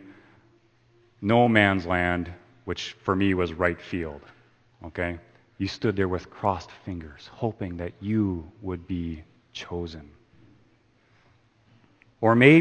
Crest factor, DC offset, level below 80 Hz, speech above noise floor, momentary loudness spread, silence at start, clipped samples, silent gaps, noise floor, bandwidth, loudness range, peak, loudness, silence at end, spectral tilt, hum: 26 dB; under 0.1%; -52 dBFS; 38 dB; 19 LU; 0.05 s; under 0.1%; none; -62 dBFS; 8.8 kHz; 11 LU; 0 dBFS; -26 LUFS; 0 s; -7 dB/octave; none